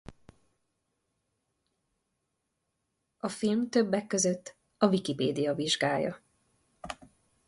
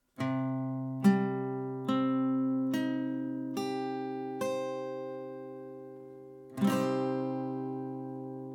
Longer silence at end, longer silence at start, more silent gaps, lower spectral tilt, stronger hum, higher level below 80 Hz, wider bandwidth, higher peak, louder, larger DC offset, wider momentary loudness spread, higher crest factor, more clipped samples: first, 0.55 s vs 0 s; about the same, 0.1 s vs 0.2 s; neither; second, -4 dB/octave vs -7 dB/octave; neither; first, -68 dBFS vs -80 dBFS; second, 11.5 kHz vs 17 kHz; about the same, -12 dBFS vs -12 dBFS; first, -29 LUFS vs -33 LUFS; neither; about the same, 17 LU vs 16 LU; about the same, 22 dB vs 20 dB; neither